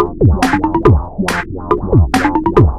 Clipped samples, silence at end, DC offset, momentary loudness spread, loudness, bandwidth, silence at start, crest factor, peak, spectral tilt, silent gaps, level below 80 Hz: 0.3%; 0 s; under 0.1%; 6 LU; -13 LUFS; 14 kHz; 0 s; 12 dB; 0 dBFS; -7 dB/octave; none; -22 dBFS